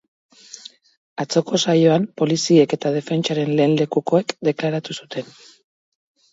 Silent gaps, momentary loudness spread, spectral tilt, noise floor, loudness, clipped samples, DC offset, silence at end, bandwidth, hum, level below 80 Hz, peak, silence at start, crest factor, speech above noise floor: 0.97-1.16 s; 21 LU; -5.5 dB/octave; -42 dBFS; -19 LUFS; under 0.1%; under 0.1%; 1.1 s; 8 kHz; none; -66 dBFS; -2 dBFS; 0.55 s; 18 dB; 24 dB